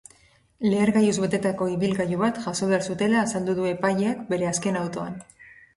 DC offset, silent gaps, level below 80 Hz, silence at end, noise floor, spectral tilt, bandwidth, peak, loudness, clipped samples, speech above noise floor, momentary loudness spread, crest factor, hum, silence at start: under 0.1%; none; -60 dBFS; 0.25 s; -58 dBFS; -5.5 dB/octave; 11.5 kHz; -8 dBFS; -24 LUFS; under 0.1%; 34 dB; 7 LU; 16 dB; none; 0.6 s